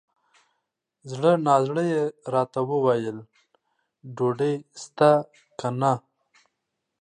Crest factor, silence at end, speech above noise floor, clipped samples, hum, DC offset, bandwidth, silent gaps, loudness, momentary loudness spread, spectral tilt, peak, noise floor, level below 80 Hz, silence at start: 22 dB; 1 s; 58 dB; under 0.1%; none; under 0.1%; 10.5 kHz; none; -24 LUFS; 16 LU; -7 dB/octave; -4 dBFS; -81 dBFS; -74 dBFS; 1.05 s